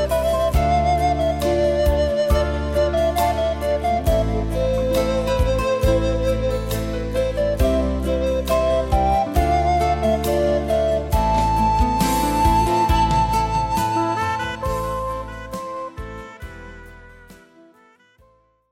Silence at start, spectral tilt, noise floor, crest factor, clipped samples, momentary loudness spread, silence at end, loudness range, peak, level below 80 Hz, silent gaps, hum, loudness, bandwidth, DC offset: 0 s; -6 dB/octave; -57 dBFS; 14 dB; under 0.1%; 9 LU; 1.35 s; 9 LU; -6 dBFS; -26 dBFS; none; none; -20 LUFS; 16.5 kHz; under 0.1%